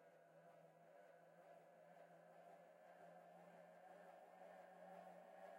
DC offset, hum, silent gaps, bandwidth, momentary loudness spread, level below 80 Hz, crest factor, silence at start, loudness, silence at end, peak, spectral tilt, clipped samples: under 0.1%; none; none; 16 kHz; 7 LU; under -90 dBFS; 16 dB; 0 s; -65 LUFS; 0 s; -50 dBFS; -5.5 dB/octave; under 0.1%